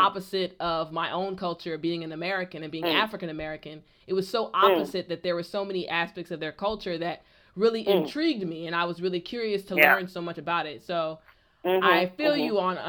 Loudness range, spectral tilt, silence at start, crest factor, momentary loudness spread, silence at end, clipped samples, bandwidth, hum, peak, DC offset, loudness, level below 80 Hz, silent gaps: 5 LU; -5.5 dB/octave; 0 s; 24 dB; 13 LU; 0 s; under 0.1%; over 20 kHz; none; -2 dBFS; under 0.1%; -27 LUFS; -62 dBFS; none